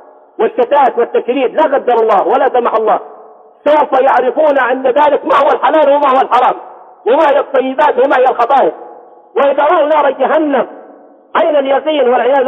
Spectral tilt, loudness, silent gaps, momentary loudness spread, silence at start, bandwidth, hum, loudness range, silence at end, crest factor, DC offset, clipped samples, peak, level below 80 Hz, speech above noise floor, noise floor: -5.5 dB/octave; -11 LUFS; none; 6 LU; 0.4 s; 6.6 kHz; none; 2 LU; 0 s; 10 dB; under 0.1%; under 0.1%; 0 dBFS; -64 dBFS; 29 dB; -39 dBFS